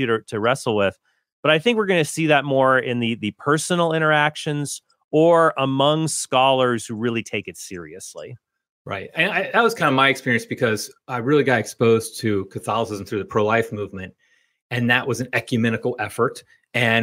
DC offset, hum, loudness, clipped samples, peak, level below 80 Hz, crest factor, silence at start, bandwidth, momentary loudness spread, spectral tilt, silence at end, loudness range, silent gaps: under 0.1%; none; -20 LUFS; under 0.1%; -2 dBFS; -64 dBFS; 18 dB; 0 s; 16 kHz; 13 LU; -4.5 dB/octave; 0 s; 4 LU; 1.32-1.43 s, 5.04-5.09 s, 8.69-8.85 s, 14.62-14.70 s